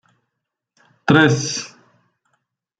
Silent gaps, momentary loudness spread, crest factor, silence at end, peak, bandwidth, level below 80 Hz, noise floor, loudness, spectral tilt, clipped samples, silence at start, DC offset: none; 15 LU; 20 dB; 1.15 s; -2 dBFS; 9.2 kHz; -56 dBFS; -80 dBFS; -17 LUFS; -4.5 dB/octave; under 0.1%; 1.05 s; under 0.1%